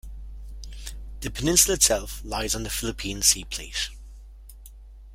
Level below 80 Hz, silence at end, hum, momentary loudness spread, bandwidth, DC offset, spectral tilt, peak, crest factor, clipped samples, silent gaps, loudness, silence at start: -38 dBFS; 0 s; none; 23 LU; 16.5 kHz; under 0.1%; -2 dB/octave; -2 dBFS; 26 dB; under 0.1%; none; -23 LUFS; 0.05 s